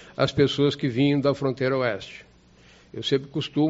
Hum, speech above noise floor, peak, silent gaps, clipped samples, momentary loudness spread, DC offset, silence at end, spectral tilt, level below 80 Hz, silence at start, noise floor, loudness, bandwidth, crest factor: none; 30 dB; -6 dBFS; none; under 0.1%; 14 LU; under 0.1%; 0 s; -5 dB/octave; -56 dBFS; 0 s; -54 dBFS; -24 LUFS; 8 kHz; 18 dB